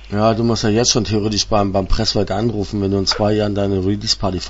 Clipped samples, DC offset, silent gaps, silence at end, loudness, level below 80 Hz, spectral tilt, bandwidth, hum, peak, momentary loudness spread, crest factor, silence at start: under 0.1%; under 0.1%; none; 0 s; -17 LUFS; -30 dBFS; -4.5 dB/octave; 8 kHz; none; 0 dBFS; 4 LU; 16 dB; 0 s